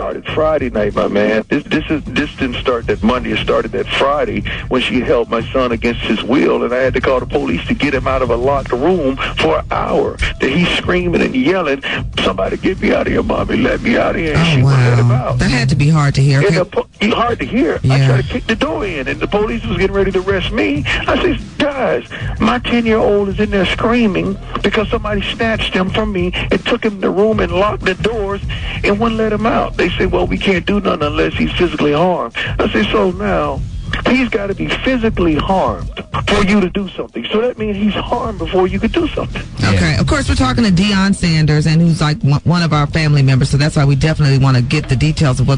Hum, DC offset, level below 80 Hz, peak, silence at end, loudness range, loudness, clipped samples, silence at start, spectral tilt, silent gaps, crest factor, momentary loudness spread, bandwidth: none; under 0.1%; -28 dBFS; -2 dBFS; 0 s; 3 LU; -15 LUFS; under 0.1%; 0 s; -6.5 dB/octave; none; 12 dB; 6 LU; 10.5 kHz